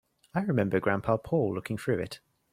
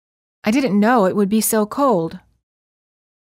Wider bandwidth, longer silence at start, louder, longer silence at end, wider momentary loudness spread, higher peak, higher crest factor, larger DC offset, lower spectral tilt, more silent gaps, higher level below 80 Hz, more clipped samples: about the same, 15.5 kHz vs 16 kHz; about the same, 0.35 s vs 0.45 s; second, -30 LUFS vs -17 LUFS; second, 0.35 s vs 1.05 s; about the same, 8 LU vs 7 LU; second, -12 dBFS vs -4 dBFS; about the same, 18 dB vs 16 dB; neither; first, -7.5 dB/octave vs -5 dB/octave; neither; about the same, -60 dBFS vs -58 dBFS; neither